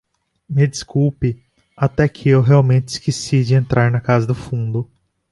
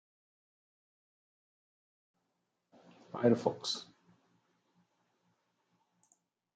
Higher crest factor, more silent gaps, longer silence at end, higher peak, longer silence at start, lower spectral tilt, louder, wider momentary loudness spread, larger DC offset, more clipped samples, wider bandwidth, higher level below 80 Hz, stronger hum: second, 16 dB vs 28 dB; neither; second, 0.5 s vs 2.75 s; first, -2 dBFS vs -14 dBFS; second, 0.5 s vs 3.15 s; first, -7 dB/octave vs -5.5 dB/octave; first, -17 LUFS vs -33 LUFS; about the same, 10 LU vs 11 LU; neither; neither; first, 11.5 kHz vs 9 kHz; first, -44 dBFS vs -90 dBFS; neither